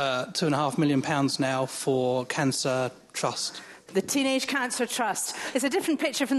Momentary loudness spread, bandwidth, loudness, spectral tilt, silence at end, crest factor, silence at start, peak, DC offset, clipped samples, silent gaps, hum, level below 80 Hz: 6 LU; 13 kHz; -27 LUFS; -4 dB/octave; 0 s; 16 dB; 0 s; -12 dBFS; under 0.1%; under 0.1%; none; none; -72 dBFS